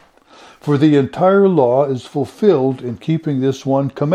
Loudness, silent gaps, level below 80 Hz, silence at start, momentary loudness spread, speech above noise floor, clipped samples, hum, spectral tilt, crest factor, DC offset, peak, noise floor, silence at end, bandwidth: -16 LUFS; none; -58 dBFS; 0.65 s; 9 LU; 30 dB; under 0.1%; none; -8 dB/octave; 14 dB; under 0.1%; 0 dBFS; -45 dBFS; 0 s; 10 kHz